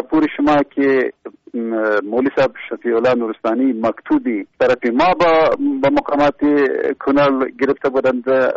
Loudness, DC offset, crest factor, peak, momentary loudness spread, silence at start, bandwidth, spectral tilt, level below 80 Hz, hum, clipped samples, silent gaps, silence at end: -16 LUFS; under 0.1%; 10 dB; -6 dBFS; 6 LU; 0 s; 7.6 kHz; -4 dB/octave; -50 dBFS; none; under 0.1%; none; 0 s